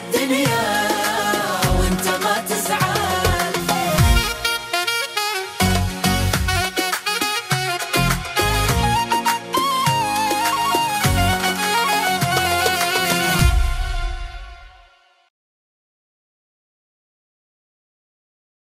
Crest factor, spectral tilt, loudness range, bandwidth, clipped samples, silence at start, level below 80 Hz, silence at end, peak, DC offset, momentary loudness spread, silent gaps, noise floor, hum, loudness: 18 dB; -3.5 dB/octave; 4 LU; 16 kHz; under 0.1%; 0 s; -28 dBFS; 4.05 s; -2 dBFS; under 0.1%; 3 LU; none; -53 dBFS; none; -19 LUFS